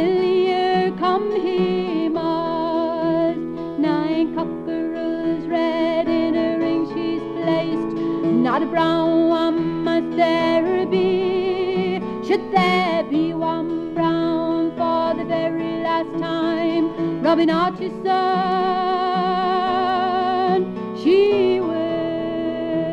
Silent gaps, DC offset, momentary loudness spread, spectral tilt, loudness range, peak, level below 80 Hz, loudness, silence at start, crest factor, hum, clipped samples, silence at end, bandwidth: none; under 0.1%; 6 LU; -7.5 dB/octave; 3 LU; -4 dBFS; -54 dBFS; -20 LUFS; 0 s; 16 dB; none; under 0.1%; 0 s; 7.4 kHz